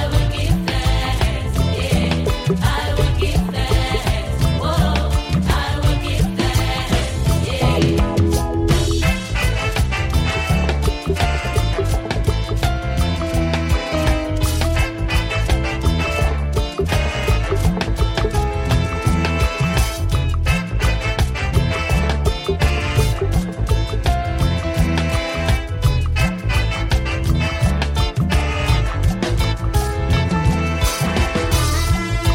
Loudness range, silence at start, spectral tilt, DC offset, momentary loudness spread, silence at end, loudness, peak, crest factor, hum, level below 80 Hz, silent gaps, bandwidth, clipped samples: 1 LU; 0 s; -5.5 dB/octave; under 0.1%; 2 LU; 0 s; -19 LUFS; -4 dBFS; 14 dB; none; -22 dBFS; none; 16.5 kHz; under 0.1%